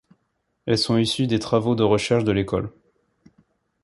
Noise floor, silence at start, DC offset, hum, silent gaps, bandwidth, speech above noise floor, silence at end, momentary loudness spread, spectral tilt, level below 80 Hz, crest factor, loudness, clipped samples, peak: -73 dBFS; 0.65 s; under 0.1%; none; none; 11.5 kHz; 52 dB; 1.15 s; 8 LU; -6 dB/octave; -48 dBFS; 18 dB; -21 LUFS; under 0.1%; -4 dBFS